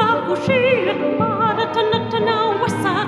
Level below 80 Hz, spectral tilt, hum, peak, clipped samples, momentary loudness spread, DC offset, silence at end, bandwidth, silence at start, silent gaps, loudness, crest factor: -56 dBFS; -6 dB/octave; none; -4 dBFS; under 0.1%; 3 LU; under 0.1%; 0 s; 13 kHz; 0 s; none; -18 LUFS; 14 dB